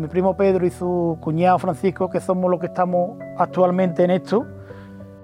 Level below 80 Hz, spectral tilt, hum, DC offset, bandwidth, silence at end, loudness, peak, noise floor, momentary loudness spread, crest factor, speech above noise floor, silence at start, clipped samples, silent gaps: -52 dBFS; -8.5 dB/octave; none; under 0.1%; 11 kHz; 0 s; -20 LUFS; -4 dBFS; -39 dBFS; 11 LU; 16 dB; 19 dB; 0 s; under 0.1%; none